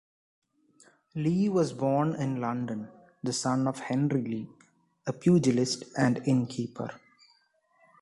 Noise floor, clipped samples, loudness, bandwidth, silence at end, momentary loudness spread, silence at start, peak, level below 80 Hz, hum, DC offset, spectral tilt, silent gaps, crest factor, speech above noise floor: -68 dBFS; under 0.1%; -29 LUFS; 11.5 kHz; 1.05 s; 14 LU; 1.15 s; -12 dBFS; -66 dBFS; none; under 0.1%; -6 dB/octave; none; 18 dB; 41 dB